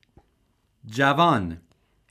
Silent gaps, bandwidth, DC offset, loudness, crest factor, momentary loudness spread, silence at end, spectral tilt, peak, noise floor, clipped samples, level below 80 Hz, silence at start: none; 15.5 kHz; under 0.1%; -22 LUFS; 20 dB; 17 LU; 0.55 s; -6 dB/octave; -6 dBFS; -68 dBFS; under 0.1%; -56 dBFS; 0.85 s